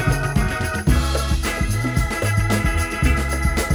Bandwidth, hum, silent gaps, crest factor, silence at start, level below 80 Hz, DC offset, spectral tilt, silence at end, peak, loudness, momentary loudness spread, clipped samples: over 20 kHz; none; none; 16 dB; 0 s; -24 dBFS; under 0.1%; -5 dB/octave; 0 s; -2 dBFS; -21 LUFS; 2 LU; under 0.1%